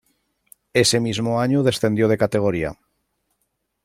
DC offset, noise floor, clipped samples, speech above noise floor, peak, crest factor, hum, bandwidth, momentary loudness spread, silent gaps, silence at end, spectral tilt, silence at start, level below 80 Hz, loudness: under 0.1%; -73 dBFS; under 0.1%; 54 dB; -4 dBFS; 18 dB; none; 15.5 kHz; 6 LU; none; 1.1 s; -5 dB/octave; 0.75 s; -52 dBFS; -20 LUFS